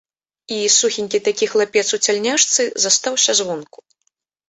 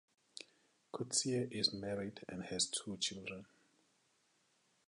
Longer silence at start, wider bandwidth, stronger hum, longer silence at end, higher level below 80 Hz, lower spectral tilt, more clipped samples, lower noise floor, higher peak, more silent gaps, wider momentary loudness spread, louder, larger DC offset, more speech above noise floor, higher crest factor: first, 0.5 s vs 0.35 s; second, 8.4 kHz vs 11 kHz; neither; second, 0.85 s vs 1.45 s; first, -68 dBFS vs -74 dBFS; second, -0.5 dB/octave vs -2.5 dB/octave; neither; second, -70 dBFS vs -77 dBFS; first, -2 dBFS vs -20 dBFS; neither; second, 7 LU vs 18 LU; first, -16 LUFS vs -39 LUFS; neither; first, 52 dB vs 36 dB; about the same, 18 dB vs 22 dB